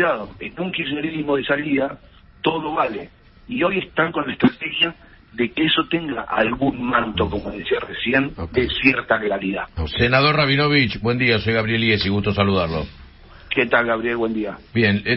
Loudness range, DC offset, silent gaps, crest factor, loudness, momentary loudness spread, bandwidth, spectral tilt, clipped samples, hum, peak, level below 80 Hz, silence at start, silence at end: 5 LU; under 0.1%; none; 20 dB; -20 LUFS; 9 LU; 5.8 kHz; -10.5 dB/octave; under 0.1%; none; 0 dBFS; -42 dBFS; 0 s; 0 s